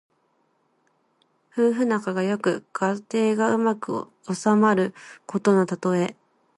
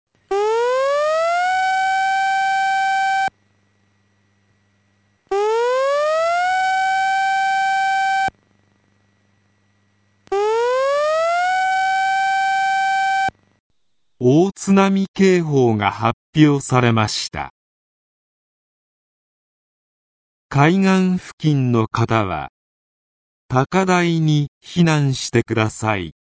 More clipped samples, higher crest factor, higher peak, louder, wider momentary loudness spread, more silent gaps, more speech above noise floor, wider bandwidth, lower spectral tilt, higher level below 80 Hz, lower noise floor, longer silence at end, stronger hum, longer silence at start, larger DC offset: neither; about the same, 18 dB vs 20 dB; second, -6 dBFS vs 0 dBFS; second, -23 LUFS vs -18 LUFS; first, 11 LU vs 7 LU; second, none vs 13.60-13.70 s, 15.08-15.14 s, 16.13-16.33 s, 17.50-20.49 s, 21.33-21.38 s, 22.49-23.49 s, 24.48-24.61 s; second, 45 dB vs 56 dB; first, 11.5 kHz vs 8 kHz; about the same, -6.5 dB/octave vs -5.5 dB/octave; second, -72 dBFS vs -52 dBFS; second, -68 dBFS vs -73 dBFS; first, 0.45 s vs 0.25 s; neither; first, 1.55 s vs 0.3 s; neither